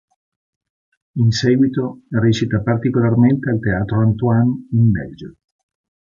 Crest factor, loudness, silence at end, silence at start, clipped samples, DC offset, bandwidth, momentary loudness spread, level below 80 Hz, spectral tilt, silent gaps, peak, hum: 14 dB; -17 LUFS; 0.7 s; 1.15 s; under 0.1%; under 0.1%; 7.4 kHz; 8 LU; -44 dBFS; -7.5 dB/octave; none; -2 dBFS; none